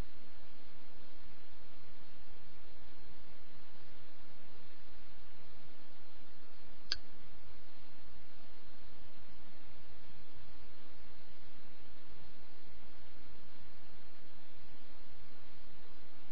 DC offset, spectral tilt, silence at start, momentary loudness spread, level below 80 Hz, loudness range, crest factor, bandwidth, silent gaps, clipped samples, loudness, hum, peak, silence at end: 4%; -5 dB/octave; 0 s; 1 LU; -64 dBFS; 11 LU; 38 dB; 5.4 kHz; none; under 0.1%; -56 LUFS; none; -14 dBFS; 0 s